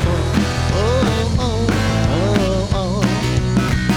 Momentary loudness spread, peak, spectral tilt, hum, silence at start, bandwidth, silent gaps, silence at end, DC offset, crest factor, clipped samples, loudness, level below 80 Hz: 2 LU; 0 dBFS; -6 dB/octave; none; 0 s; 15.5 kHz; none; 0 s; under 0.1%; 16 dB; under 0.1%; -17 LUFS; -26 dBFS